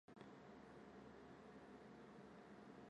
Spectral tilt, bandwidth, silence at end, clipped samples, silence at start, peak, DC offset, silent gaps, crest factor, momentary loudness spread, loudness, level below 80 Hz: -6.5 dB/octave; 10.5 kHz; 0 s; under 0.1%; 0.1 s; -44 dBFS; under 0.1%; none; 18 dB; 1 LU; -62 LUFS; -82 dBFS